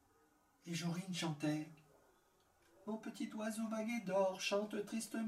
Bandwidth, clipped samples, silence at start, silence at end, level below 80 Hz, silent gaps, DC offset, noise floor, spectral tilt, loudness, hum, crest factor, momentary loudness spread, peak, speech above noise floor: 16 kHz; under 0.1%; 0.65 s; 0 s; -82 dBFS; none; under 0.1%; -74 dBFS; -5 dB/octave; -42 LUFS; none; 16 dB; 10 LU; -26 dBFS; 33 dB